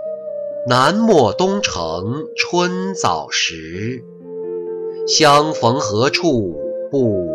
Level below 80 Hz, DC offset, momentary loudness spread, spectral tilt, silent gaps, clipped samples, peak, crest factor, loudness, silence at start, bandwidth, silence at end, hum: -48 dBFS; under 0.1%; 14 LU; -4 dB/octave; none; under 0.1%; -2 dBFS; 16 dB; -17 LUFS; 0 s; 14.5 kHz; 0 s; none